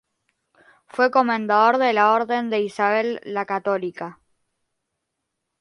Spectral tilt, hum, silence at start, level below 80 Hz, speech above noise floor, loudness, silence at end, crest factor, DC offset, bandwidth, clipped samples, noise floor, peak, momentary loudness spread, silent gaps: -5.5 dB/octave; none; 0.95 s; -74 dBFS; 59 dB; -20 LUFS; 1.5 s; 18 dB; under 0.1%; 11.5 kHz; under 0.1%; -79 dBFS; -4 dBFS; 12 LU; none